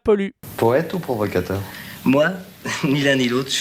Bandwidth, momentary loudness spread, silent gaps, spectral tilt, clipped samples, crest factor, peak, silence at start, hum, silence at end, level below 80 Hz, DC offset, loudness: 16.5 kHz; 10 LU; none; -5 dB/octave; under 0.1%; 16 dB; -4 dBFS; 0.05 s; none; 0 s; -52 dBFS; under 0.1%; -20 LUFS